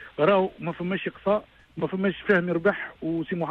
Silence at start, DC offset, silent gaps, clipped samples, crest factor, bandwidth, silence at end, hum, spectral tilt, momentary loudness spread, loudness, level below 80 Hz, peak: 0 s; under 0.1%; none; under 0.1%; 18 dB; 5.4 kHz; 0 s; none; -8.5 dB/octave; 10 LU; -26 LUFS; -60 dBFS; -8 dBFS